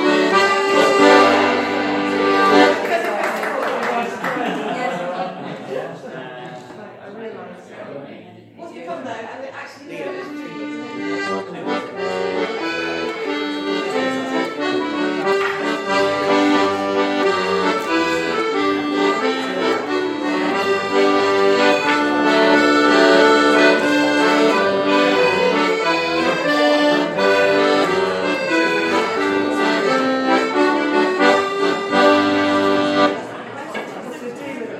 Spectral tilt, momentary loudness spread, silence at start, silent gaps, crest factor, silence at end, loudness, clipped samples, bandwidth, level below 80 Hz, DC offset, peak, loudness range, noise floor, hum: -4 dB/octave; 17 LU; 0 s; none; 18 dB; 0 s; -17 LUFS; under 0.1%; 13.5 kHz; -62 dBFS; under 0.1%; 0 dBFS; 16 LU; -39 dBFS; none